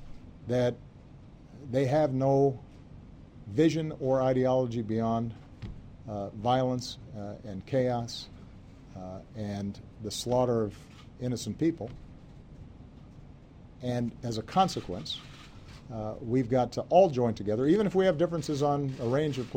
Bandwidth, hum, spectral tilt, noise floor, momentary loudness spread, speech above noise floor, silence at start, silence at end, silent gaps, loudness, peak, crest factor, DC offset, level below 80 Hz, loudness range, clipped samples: 16 kHz; none; -6.5 dB/octave; -51 dBFS; 23 LU; 22 dB; 0 s; 0 s; none; -29 LUFS; -10 dBFS; 20 dB; under 0.1%; -54 dBFS; 8 LU; under 0.1%